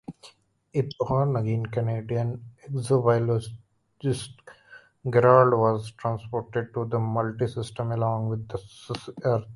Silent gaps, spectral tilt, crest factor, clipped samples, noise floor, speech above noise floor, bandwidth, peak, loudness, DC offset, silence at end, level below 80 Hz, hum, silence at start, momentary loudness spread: none; -7.5 dB/octave; 22 dB; under 0.1%; -54 dBFS; 29 dB; 11.5 kHz; -2 dBFS; -26 LUFS; under 0.1%; 0 s; -56 dBFS; none; 0.1 s; 15 LU